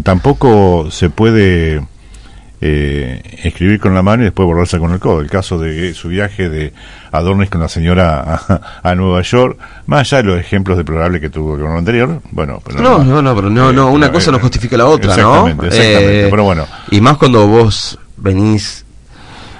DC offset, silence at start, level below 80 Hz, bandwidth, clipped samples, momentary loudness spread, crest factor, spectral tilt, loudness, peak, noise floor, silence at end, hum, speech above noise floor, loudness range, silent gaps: under 0.1%; 0 s; -28 dBFS; 11 kHz; 1%; 11 LU; 10 dB; -6.5 dB/octave; -11 LUFS; 0 dBFS; -35 dBFS; 0 s; none; 25 dB; 6 LU; none